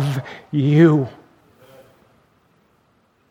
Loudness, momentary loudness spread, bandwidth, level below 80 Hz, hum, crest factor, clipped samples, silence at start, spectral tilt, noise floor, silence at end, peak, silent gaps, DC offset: -17 LUFS; 15 LU; 11.5 kHz; -64 dBFS; none; 20 dB; under 0.1%; 0 s; -8.5 dB/octave; -61 dBFS; 2.2 s; -2 dBFS; none; under 0.1%